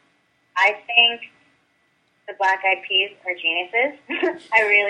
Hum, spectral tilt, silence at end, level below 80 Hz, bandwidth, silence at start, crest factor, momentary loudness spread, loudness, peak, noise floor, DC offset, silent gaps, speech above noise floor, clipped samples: none; -1.5 dB/octave; 0 s; -78 dBFS; 10 kHz; 0.55 s; 20 dB; 9 LU; -19 LUFS; -2 dBFS; -65 dBFS; under 0.1%; none; 44 dB; under 0.1%